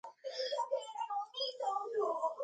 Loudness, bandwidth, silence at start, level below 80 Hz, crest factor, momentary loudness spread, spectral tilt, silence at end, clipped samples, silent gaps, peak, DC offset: -38 LUFS; 9 kHz; 0.05 s; under -90 dBFS; 14 dB; 4 LU; -0.5 dB/octave; 0 s; under 0.1%; none; -24 dBFS; under 0.1%